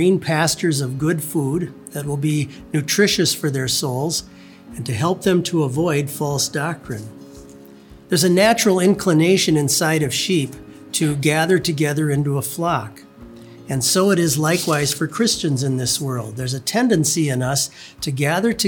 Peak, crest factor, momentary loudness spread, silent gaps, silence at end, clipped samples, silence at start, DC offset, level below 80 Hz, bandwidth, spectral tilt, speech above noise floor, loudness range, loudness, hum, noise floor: -2 dBFS; 18 dB; 10 LU; none; 0 s; under 0.1%; 0 s; under 0.1%; -52 dBFS; over 20 kHz; -4.5 dB/octave; 24 dB; 4 LU; -19 LUFS; none; -43 dBFS